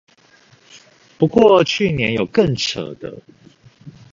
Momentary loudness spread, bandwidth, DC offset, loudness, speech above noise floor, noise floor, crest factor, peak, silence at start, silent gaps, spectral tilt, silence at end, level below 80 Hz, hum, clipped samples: 18 LU; 7.6 kHz; under 0.1%; -16 LUFS; 35 dB; -52 dBFS; 18 dB; 0 dBFS; 1.2 s; none; -5.5 dB/octave; 0.2 s; -48 dBFS; none; under 0.1%